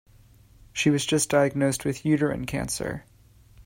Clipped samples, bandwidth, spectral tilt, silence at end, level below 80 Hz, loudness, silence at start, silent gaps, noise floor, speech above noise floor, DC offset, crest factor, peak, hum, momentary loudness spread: under 0.1%; 16.5 kHz; -4.5 dB/octave; 0.05 s; -50 dBFS; -25 LUFS; 0.75 s; none; -54 dBFS; 30 dB; under 0.1%; 18 dB; -10 dBFS; none; 10 LU